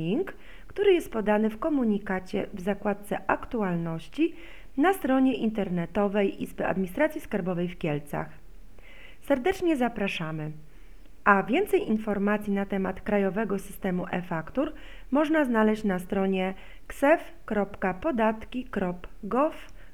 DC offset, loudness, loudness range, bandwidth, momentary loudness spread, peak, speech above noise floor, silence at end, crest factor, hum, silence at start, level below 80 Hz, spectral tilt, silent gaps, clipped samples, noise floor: 0.8%; -28 LUFS; 3 LU; 16 kHz; 10 LU; -6 dBFS; 23 dB; 0.05 s; 22 dB; none; 0 s; -50 dBFS; -7 dB/octave; none; under 0.1%; -50 dBFS